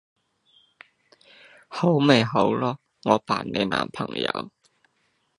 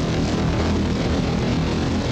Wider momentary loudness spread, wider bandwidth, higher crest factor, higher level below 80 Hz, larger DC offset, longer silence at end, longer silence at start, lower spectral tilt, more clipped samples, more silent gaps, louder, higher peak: first, 13 LU vs 1 LU; first, 11.5 kHz vs 9.2 kHz; first, 24 dB vs 10 dB; second, -62 dBFS vs -30 dBFS; neither; first, 0.9 s vs 0 s; first, 1.7 s vs 0 s; about the same, -6 dB/octave vs -6.5 dB/octave; neither; neither; about the same, -23 LUFS vs -22 LUFS; first, -2 dBFS vs -10 dBFS